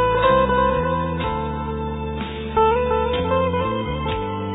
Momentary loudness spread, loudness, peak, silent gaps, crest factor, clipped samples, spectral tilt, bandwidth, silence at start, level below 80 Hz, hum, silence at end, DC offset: 10 LU; -21 LUFS; -6 dBFS; none; 16 dB; under 0.1%; -10 dB/octave; 4 kHz; 0 s; -34 dBFS; none; 0 s; under 0.1%